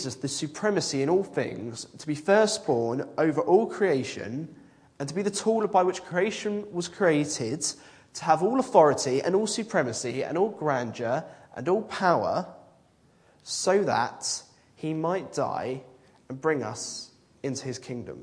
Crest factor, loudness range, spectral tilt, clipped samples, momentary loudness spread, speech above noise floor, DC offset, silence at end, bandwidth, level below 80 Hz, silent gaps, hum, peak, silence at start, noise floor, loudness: 22 dB; 5 LU; -4.5 dB/octave; under 0.1%; 14 LU; 35 dB; under 0.1%; 0 s; 10.5 kHz; -70 dBFS; none; none; -4 dBFS; 0 s; -61 dBFS; -27 LUFS